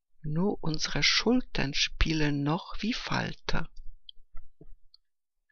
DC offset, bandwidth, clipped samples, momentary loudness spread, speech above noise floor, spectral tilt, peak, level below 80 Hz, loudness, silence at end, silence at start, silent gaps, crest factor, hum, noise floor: under 0.1%; 7 kHz; under 0.1%; 11 LU; 50 dB; -4 dB/octave; -8 dBFS; -40 dBFS; -29 LUFS; 0.65 s; 0.2 s; none; 22 dB; none; -78 dBFS